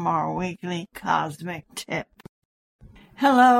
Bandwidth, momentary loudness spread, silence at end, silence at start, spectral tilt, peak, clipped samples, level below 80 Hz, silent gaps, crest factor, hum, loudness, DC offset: 15.5 kHz; 13 LU; 0 s; 0 s; -5 dB/octave; -6 dBFS; under 0.1%; -58 dBFS; 2.29-2.79 s; 18 dB; none; -26 LUFS; under 0.1%